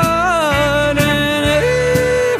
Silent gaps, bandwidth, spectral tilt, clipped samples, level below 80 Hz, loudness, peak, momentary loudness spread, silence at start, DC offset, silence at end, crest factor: none; 15.5 kHz; -4.5 dB/octave; under 0.1%; -32 dBFS; -14 LUFS; -2 dBFS; 0 LU; 0 s; under 0.1%; 0 s; 12 dB